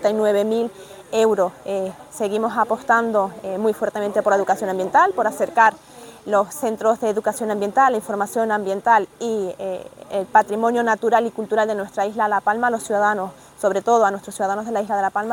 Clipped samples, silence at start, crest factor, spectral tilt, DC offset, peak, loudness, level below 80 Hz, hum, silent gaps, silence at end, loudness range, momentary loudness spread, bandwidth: under 0.1%; 0 s; 18 dB; -4.5 dB/octave; under 0.1%; -2 dBFS; -20 LUFS; -62 dBFS; none; none; 0 s; 2 LU; 9 LU; 19 kHz